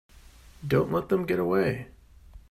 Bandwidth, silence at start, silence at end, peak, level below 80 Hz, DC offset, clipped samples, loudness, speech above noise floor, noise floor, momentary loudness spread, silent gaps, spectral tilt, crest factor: 15.5 kHz; 0.15 s; 0.1 s; -10 dBFS; -52 dBFS; under 0.1%; under 0.1%; -27 LUFS; 25 dB; -51 dBFS; 14 LU; none; -8 dB/octave; 18 dB